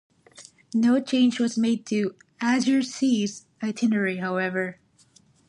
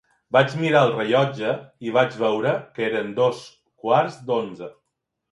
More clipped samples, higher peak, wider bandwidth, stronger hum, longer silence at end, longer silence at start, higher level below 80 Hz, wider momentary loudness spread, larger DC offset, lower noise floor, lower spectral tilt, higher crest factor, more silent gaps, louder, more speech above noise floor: neither; second, -10 dBFS vs -4 dBFS; about the same, 11 kHz vs 11.5 kHz; neither; first, 0.75 s vs 0.6 s; about the same, 0.4 s vs 0.3 s; second, -74 dBFS vs -68 dBFS; about the same, 10 LU vs 12 LU; neither; second, -59 dBFS vs -79 dBFS; second, -5 dB/octave vs -6.5 dB/octave; second, 14 dB vs 20 dB; neither; about the same, -24 LUFS vs -22 LUFS; second, 36 dB vs 58 dB